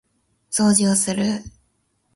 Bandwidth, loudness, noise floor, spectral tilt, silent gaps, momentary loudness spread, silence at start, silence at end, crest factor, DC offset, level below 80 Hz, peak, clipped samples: 11.5 kHz; -19 LUFS; -67 dBFS; -4 dB/octave; none; 10 LU; 0.5 s; 0.65 s; 20 dB; under 0.1%; -54 dBFS; -2 dBFS; under 0.1%